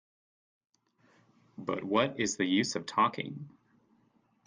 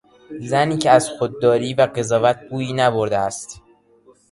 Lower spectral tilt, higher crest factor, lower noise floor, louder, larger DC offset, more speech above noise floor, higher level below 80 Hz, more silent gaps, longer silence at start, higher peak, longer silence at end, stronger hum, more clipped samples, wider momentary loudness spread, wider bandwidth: about the same, -4 dB/octave vs -5 dB/octave; about the same, 20 dB vs 18 dB; first, -70 dBFS vs -53 dBFS; second, -31 LUFS vs -18 LUFS; neither; first, 39 dB vs 35 dB; second, -74 dBFS vs -56 dBFS; neither; first, 1.6 s vs 0.3 s; second, -14 dBFS vs 0 dBFS; first, 0.95 s vs 0.75 s; neither; neither; about the same, 13 LU vs 14 LU; second, 10 kHz vs 11.5 kHz